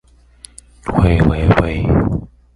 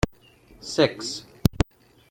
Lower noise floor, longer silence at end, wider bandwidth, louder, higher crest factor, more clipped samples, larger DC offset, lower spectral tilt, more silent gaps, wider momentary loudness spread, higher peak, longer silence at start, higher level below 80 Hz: second, -43 dBFS vs -53 dBFS; second, 0.3 s vs 0.5 s; second, 11.5 kHz vs 16.5 kHz; first, -15 LUFS vs -26 LUFS; second, 16 dB vs 24 dB; neither; neither; first, -8 dB/octave vs -5 dB/octave; neither; about the same, 10 LU vs 10 LU; about the same, 0 dBFS vs -2 dBFS; first, 0.85 s vs 0.05 s; first, -24 dBFS vs -38 dBFS